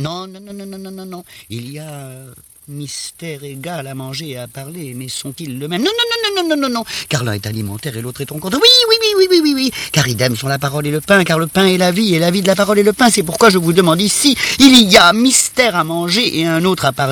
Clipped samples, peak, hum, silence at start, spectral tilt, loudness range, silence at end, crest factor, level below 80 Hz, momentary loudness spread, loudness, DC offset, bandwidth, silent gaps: 0.4%; 0 dBFS; none; 0 s; -3.5 dB/octave; 17 LU; 0 s; 14 dB; -48 dBFS; 22 LU; -12 LUFS; under 0.1%; over 20 kHz; none